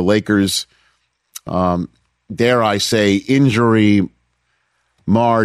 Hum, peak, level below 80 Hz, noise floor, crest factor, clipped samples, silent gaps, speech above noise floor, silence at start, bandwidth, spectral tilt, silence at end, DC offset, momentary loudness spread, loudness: 60 Hz at -40 dBFS; -2 dBFS; -50 dBFS; -66 dBFS; 14 dB; under 0.1%; none; 51 dB; 0 s; 15 kHz; -5.5 dB/octave; 0 s; under 0.1%; 18 LU; -15 LUFS